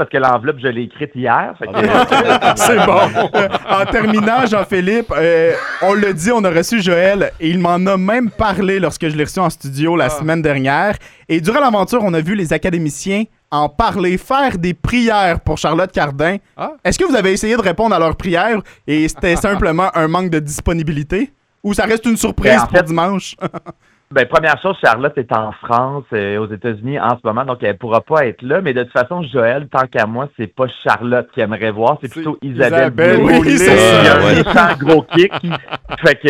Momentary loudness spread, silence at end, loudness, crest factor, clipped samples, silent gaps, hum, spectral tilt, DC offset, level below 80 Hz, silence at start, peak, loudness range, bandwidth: 10 LU; 0 s; -14 LUFS; 14 dB; under 0.1%; none; none; -5 dB/octave; under 0.1%; -36 dBFS; 0 s; 0 dBFS; 6 LU; 16.5 kHz